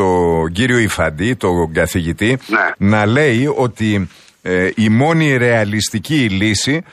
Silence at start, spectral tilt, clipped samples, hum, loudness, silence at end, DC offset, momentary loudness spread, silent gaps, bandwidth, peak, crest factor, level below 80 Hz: 0 s; -5.5 dB/octave; under 0.1%; none; -15 LUFS; 0.1 s; under 0.1%; 5 LU; none; 15 kHz; -2 dBFS; 12 dB; -38 dBFS